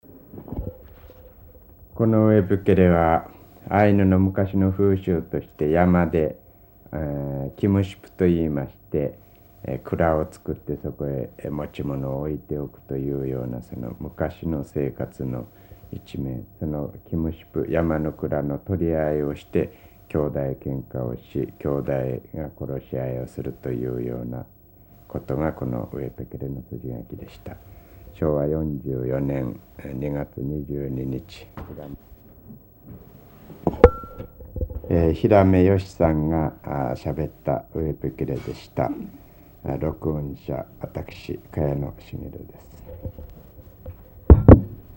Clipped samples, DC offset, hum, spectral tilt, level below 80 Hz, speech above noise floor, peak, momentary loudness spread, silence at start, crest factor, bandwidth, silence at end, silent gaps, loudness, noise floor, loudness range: under 0.1%; under 0.1%; none; -9.5 dB/octave; -34 dBFS; 26 dB; 0 dBFS; 20 LU; 0.1 s; 24 dB; 16 kHz; 0 s; none; -24 LUFS; -50 dBFS; 11 LU